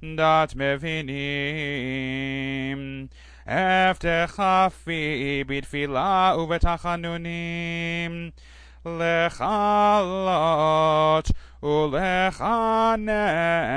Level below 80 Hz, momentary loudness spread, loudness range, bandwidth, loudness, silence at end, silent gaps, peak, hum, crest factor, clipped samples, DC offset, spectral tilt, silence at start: -38 dBFS; 10 LU; 5 LU; 10.5 kHz; -23 LUFS; 0 s; none; -8 dBFS; none; 16 dB; under 0.1%; under 0.1%; -6 dB/octave; 0 s